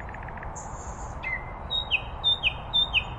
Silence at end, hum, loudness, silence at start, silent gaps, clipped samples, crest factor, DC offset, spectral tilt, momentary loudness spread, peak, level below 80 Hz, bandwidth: 0 s; none; -26 LUFS; 0 s; none; under 0.1%; 18 dB; under 0.1%; -2.5 dB/octave; 15 LU; -12 dBFS; -42 dBFS; 11.5 kHz